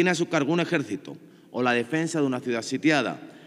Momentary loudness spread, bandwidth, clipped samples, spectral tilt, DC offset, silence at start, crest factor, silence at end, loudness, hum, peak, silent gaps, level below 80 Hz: 11 LU; 12.5 kHz; under 0.1%; -5 dB/octave; under 0.1%; 0 s; 18 dB; 0 s; -25 LUFS; none; -8 dBFS; none; -84 dBFS